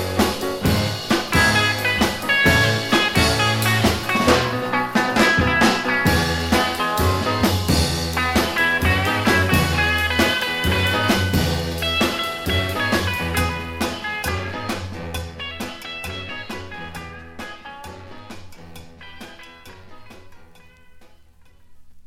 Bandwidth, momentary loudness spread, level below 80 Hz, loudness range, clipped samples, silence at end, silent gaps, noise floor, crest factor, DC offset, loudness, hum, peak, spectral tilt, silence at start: 17 kHz; 18 LU; -36 dBFS; 16 LU; under 0.1%; 0.05 s; none; -48 dBFS; 20 dB; under 0.1%; -19 LUFS; none; -2 dBFS; -4 dB/octave; 0 s